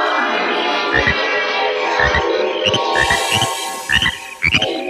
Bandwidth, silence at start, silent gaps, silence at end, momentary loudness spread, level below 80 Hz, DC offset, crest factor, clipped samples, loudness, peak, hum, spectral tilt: 15.5 kHz; 0 s; none; 0 s; 3 LU; -36 dBFS; under 0.1%; 16 dB; under 0.1%; -15 LUFS; 0 dBFS; none; -2.5 dB/octave